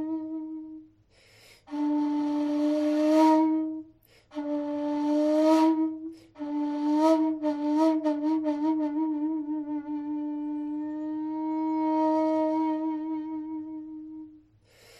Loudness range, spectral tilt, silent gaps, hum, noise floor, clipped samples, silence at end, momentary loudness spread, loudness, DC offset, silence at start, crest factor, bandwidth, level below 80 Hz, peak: 5 LU; -5.5 dB/octave; none; none; -60 dBFS; under 0.1%; 0.65 s; 17 LU; -27 LUFS; under 0.1%; 0 s; 18 dB; 10 kHz; -72 dBFS; -10 dBFS